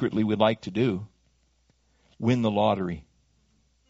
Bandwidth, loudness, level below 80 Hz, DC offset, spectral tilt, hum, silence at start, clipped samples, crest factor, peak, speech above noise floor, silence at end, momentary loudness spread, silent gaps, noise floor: 7.8 kHz; -26 LUFS; -58 dBFS; under 0.1%; -6 dB/octave; none; 0 s; under 0.1%; 22 dB; -6 dBFS; 42 dB; 0.9 s; 12 LU; none; -67 dBFS